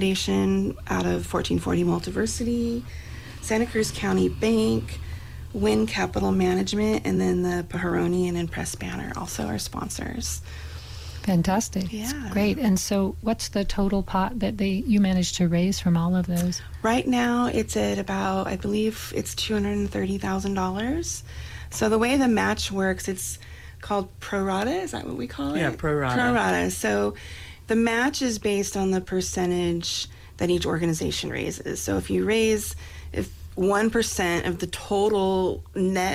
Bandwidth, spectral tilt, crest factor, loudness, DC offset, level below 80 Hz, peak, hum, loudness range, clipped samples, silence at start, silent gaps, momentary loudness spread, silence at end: 16 kHz; -5 dB/octave; 14 dB; -25 LUFS; under 0.1%; -40 dBFS; -10 dBFS; none; 4 LU; under 0.1%; 0 s; none; 10 LU; 0 s